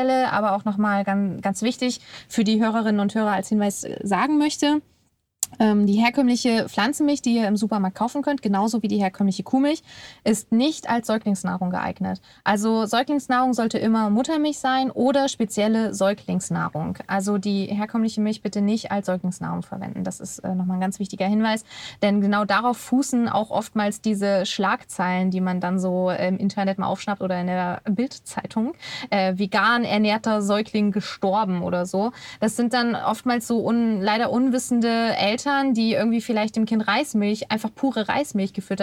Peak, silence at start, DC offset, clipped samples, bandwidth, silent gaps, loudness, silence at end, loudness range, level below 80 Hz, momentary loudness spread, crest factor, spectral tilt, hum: -2 dBFS; 0 s; under 0.1%; under 0.1%; 14.5 kHz; none; -23 LUFS; 0 s; 3 LU; -64 dBFS; 7 LU; 22 dB; -5 dB/octave; none